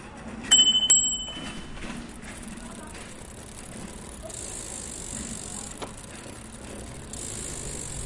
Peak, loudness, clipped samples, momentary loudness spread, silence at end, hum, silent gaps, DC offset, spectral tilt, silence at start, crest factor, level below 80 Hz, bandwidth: -6 dBFS; -23 LUFS; under 0.1%; 23 LU; 0 s; none; none; under 0.1%; -0.5 dB/octave; 0 s; 24 dB; -46 dBFS; 11.5 kHz